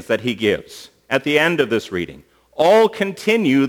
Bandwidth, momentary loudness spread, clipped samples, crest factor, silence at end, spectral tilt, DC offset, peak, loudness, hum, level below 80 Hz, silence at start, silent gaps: 20 kHz; 17 LU; under 0.1%; 18 dB; 0 s; -5 dB/octave; under 0.1%; 0 dBFS; -18 LUFS; none; -56 dBFS; 0.1 s; none